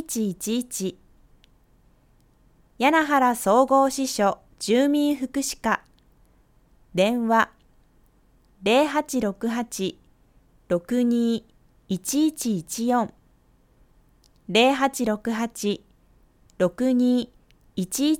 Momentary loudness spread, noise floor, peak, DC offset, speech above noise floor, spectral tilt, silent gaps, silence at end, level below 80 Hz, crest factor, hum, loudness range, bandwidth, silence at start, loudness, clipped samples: 11 LU; -59 dBFS; -6 dBFS; under 0.1%; 37 dB; -4 dB/octave; none; 0 s; -58 dBFS; 20 dB; none; 5 LU; 17.5 kHz; 0 s; -23 LUFS; under 0.1%